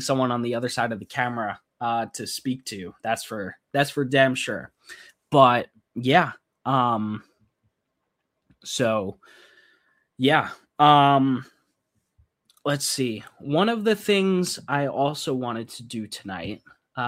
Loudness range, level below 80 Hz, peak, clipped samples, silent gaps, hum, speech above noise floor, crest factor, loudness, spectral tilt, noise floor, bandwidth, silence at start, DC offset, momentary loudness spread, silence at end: 6 LU; -66 dBFS; -2 dBFS; under 0.1%; none; none; 55 dB; 24 dB; -24 LUFS; -4.5 dB/octave; -78 dBFS; 16 kHz; 0 s; under 0.1%; 16 LU; 0 s